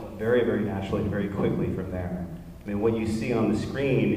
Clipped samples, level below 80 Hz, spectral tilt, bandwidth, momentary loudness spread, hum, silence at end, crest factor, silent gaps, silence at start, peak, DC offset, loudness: under 0.1%; -46 dBFS; -7.5 dB/octave; 15.5 kHz; 9 LU; none; 0 s; 16 dB; none; 0 s; -12 dBFS; under 0.1%; -27 LUFS